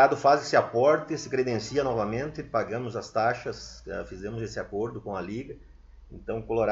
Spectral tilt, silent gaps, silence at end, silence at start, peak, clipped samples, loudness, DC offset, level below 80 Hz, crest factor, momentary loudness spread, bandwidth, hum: -5.5 dB/octave; none; 0 s; 0 s; -6 dBFS; under 0.1%; -28 LUFS; under 0.1%; -52 dBFS; 22 dB; 15 LU; 8 kHz; none